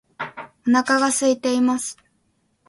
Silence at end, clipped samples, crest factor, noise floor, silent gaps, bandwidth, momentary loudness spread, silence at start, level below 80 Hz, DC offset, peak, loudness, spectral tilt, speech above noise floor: 0.75 s; under 0.1%; 16 dB; -67 dBFS; none; 12 kHz; 15 LU; 0.2 s; -68 dBFS; under 0.1%; -4 dBFS; -20 LUFS; -2.5 dB/octave; 48 dB